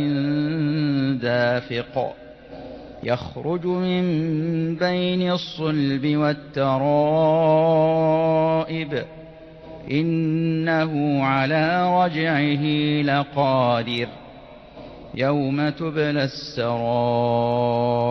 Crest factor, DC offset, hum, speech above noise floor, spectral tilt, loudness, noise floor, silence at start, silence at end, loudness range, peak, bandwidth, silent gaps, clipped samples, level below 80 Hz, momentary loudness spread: 14 dB; under 0.1%; none; 22 dB; -8 dB/octave; -21 LUFS; -43 dBFS; 0 s; 0 s; 5 LU; -8 dBFS; 6.2 kHz; none; under 0.1%; -54 dBFS; 11 LU